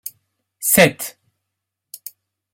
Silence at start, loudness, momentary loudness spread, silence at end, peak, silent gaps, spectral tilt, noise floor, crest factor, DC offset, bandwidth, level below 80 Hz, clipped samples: 0.05 s; -15 LUFS; 23 LU; 1.45 s; 0 dBFS; none; -3 dB/octave; -80 dBFS; 22 dB; under 0.1%; 16.5 kHz; -56 dBFS; under 0.1%